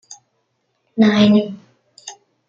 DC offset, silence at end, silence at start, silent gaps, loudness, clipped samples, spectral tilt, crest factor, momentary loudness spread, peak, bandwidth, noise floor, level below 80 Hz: under 0.1%; 0.35 s; 0.1 s; none; -14 LUFS; under 0.1%; -6 dB/octave; 16 dB; 25 LU; -2 dBFS; 7.6 kHz; -69 dBFS; -62 dBFS